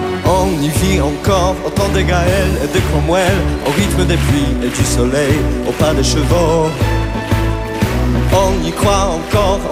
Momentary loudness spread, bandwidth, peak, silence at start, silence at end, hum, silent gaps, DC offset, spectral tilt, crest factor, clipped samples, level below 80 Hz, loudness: 4 LU; 16 kHz; 0 dBFS; 0 s; 0 s; none; none; under 0.1%; -5.5 dB/octave; 14 dB; under 0.1%; -20 dBFS; -14 LUFS